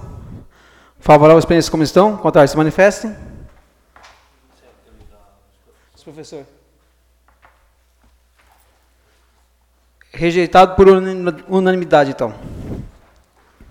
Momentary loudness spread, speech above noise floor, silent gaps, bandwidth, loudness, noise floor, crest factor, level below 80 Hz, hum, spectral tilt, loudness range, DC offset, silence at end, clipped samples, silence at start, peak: 26 LU; 45 dB; none; 15.5 kHz; -13 LUFS; -57 dBFS; 16 dB; -40 dBFS; none; -6 dB/octave; 9 LU; under 0.1%; 0.85 s; under 0.1%; 0 s; 0 dBFS